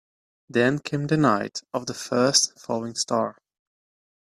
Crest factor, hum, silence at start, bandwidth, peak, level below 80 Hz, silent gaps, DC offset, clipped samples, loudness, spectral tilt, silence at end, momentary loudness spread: 22 dB; none; 0.55 s; 14 kHz; -4 dBFS; -64 dBFS; none; under 0.1%; under 0.1%; -24 LUFS; -3.5 dB/octave; 0.9 s; 11 LU